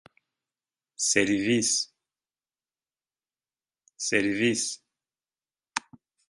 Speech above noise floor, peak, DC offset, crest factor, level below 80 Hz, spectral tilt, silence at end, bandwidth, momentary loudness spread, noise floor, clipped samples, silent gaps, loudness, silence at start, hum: over 65 dB; -4 dBFS; under 0.1%; 26 dB; -68 dBFS; -2.5 dB/octave; 0.5 s; 11.5 kHz; 12 LU; under -90 dBFS; under 0.1%; none; -26 LUFS; 1 s; none